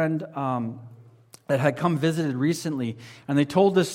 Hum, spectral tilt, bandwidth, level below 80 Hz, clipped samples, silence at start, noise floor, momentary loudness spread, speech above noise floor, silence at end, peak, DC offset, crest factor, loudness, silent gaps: none; -6.5 dB/octave; 16.5 kHz; -68 dBFS; under 0.1%; 0 s; -52 dBFS; 12 LU; 28 dB; 0 s; -6 dBFS; under 0.1%; 18 dB; -25 LUFS; none